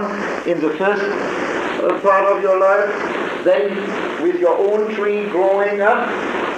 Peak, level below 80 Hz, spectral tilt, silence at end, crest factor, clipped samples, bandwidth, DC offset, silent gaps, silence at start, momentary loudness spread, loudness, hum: -2 dBFS; -60 dBFS; -5.5 dB/octave; 0 s; 14 dB; under 0.1%; 9.4 kHz; under 0.1%; none; 0 s; 6 LU; -17 LUFS; none